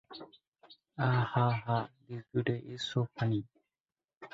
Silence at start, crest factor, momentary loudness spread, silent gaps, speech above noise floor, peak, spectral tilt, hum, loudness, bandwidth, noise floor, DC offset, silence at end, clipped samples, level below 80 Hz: 0.1 s; 20 dB; 20 LU; 0.48-0.52 s, 3.80-3.84 s, 4.17-4.21 s; over 58 dB; -14 dBFS; -7 dB/octave; none; -33 LUFS; 7.8 kHz; under -90 dBFS; under 0.1%; 0.05 s; under 0.1%; -66 dBFS